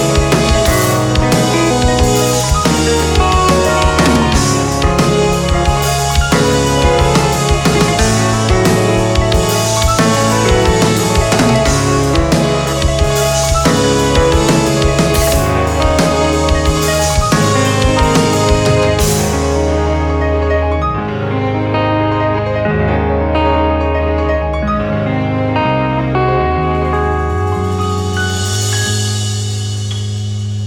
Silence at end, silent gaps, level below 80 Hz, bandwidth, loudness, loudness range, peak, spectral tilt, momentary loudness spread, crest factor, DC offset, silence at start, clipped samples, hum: 0 s; none; -20 dBFS; 19.5 kHz; -13 LUFS; 3 LU; 0 dBFS; -5 dB/octave; 5 LU; 12 dB; under 0.1%; 0 s; under 0.1%; none